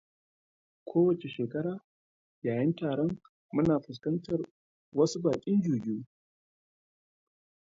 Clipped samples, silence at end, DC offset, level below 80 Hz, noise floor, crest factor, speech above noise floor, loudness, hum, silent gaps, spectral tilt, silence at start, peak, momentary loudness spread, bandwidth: under 0.1%; 1.7 s; under 0.1%; -66 dBFS; under -90 dBFS; 18 dB; over 61 dB; -31 LUFS; none; 1.84-2.42 s, 3.29-3.49 s, 4.51-4.92 s; -7.5 dB/octave; 0.85 s; -14 dBFS; 10 LU; 7.8 kHz